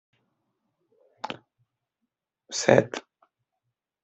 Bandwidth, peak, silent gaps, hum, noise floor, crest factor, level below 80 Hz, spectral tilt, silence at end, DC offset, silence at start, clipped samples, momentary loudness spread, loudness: 8.2 kHz; -2 dBFS; none; none; -83 dBFS; 28 dB; -70 dBFS; -4.5 dB/octave; 1.05 s; under 0.1%; 1.25 s; under 0.1%; 20 LU; -23 LUFS